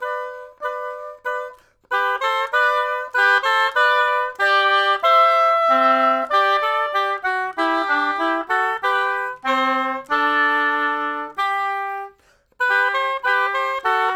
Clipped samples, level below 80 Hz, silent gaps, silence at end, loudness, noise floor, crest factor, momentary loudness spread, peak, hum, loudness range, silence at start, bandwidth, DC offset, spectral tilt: under 0.1%; -64 dBFS; none; 0 s; -18 LUFS; -56 dBFS; 14 dB; 12 LU; -4 dBFS; none; 5 LU; 0 s; 18 kHz; under 0.1%; -1.5 dB/octave